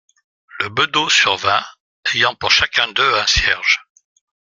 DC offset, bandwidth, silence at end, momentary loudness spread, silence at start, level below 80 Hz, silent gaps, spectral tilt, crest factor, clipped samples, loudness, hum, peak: under 0.1%; 13.5 kHz; 0.8 s; 8 LU; 0.55 s; -38 dBFS; 1.80-2.03 s; -1 dB/octave; 18 dB; under 0.1%; -15 LUFS; none; 0 dBFS